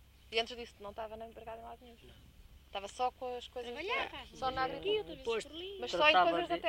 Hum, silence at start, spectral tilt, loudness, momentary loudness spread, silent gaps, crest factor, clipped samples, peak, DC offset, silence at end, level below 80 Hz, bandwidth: none; 0.25 s; -3.5 dB/octave; -35 LUFS; 19 LU; none; 24 dB; under 0.1%; -14 dBFS; under 0.1%; 0 s; -60 dBFS; 16 kHz